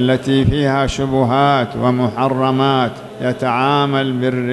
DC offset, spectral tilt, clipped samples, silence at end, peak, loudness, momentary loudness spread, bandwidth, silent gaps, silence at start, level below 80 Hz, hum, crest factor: under 0.1%; -6.5 dB/octave; under 0.1%; 0 s; -2 dBFS; -16 LUFS; 4 LU; 12 kHz; none; 0 s; -38 dBFS; none; 14 dB